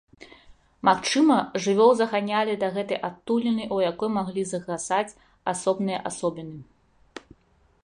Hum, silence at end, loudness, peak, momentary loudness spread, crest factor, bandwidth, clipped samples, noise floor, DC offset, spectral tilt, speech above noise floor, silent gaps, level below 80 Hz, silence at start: none; 0.65 s; -24 LUFS; -6 dBFS; 17 LU; 20 dB; 11 kHz; under 0.1%; -62 dBFS; under 0.1%; -4.5 dB/octave; 38 dB; none; -64 dBFS; 0.2 s